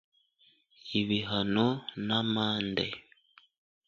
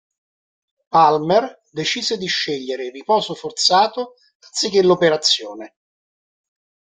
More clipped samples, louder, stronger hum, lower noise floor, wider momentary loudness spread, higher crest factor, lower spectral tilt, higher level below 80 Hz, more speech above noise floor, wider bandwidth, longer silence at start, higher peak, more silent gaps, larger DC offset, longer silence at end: neither; second, -30 LUFS vs -18 LUFS; neither; second, -67 dBFS vs under -90 dBFS; second, 8 LU vs 14 LU; about the same, 20 dB vs 18 dB; first, -6.5 dB/octave vs -3 dB/octave; about the same, -64 dBFS vs -64 dBFS; second, 37 dB vs over 72 dB; second, 7.2 kHz vs 9.6 kHz; about the same, 0.85 s vs 0.95 s; second, -12 dBFS vs -2 dBFS; second, none vs 4.35-4.40 s; neither; second, 0.85 s vs 1.2 s